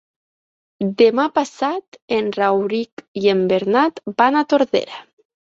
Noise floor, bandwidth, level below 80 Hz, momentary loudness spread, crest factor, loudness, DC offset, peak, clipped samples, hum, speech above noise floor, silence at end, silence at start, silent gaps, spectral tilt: under -90 dBFS; 7.8 kHz; -64 dBFS; 11 LU; 18 dB; -18 LUFS; under 0.1%; -2 dBFS; under 0.1%; none; over 72 dB; 0.55 s; 0.8 s; 1.88-1.92 s, 2.02-2.08 s, 2.92-2.97 s, 3.08-3.15 s; -6 dB/octave